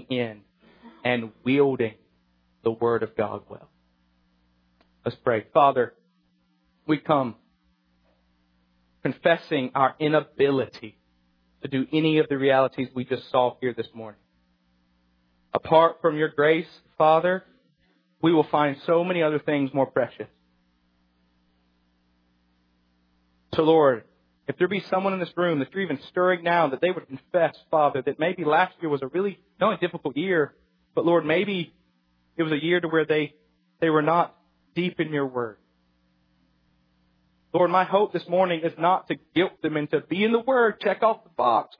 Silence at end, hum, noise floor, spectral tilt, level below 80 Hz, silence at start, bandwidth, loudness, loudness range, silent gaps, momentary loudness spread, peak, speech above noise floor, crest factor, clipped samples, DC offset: 0.15 s; none; -67 dBFS; -9 dB/octave; -68 dBFS; 0.1 s; 5.4 kHz; -24 LUFS; 5 LU; none; 10 LU; -4 dBFS; 44 dB; 20 dB; under 0.1%; under 0.1%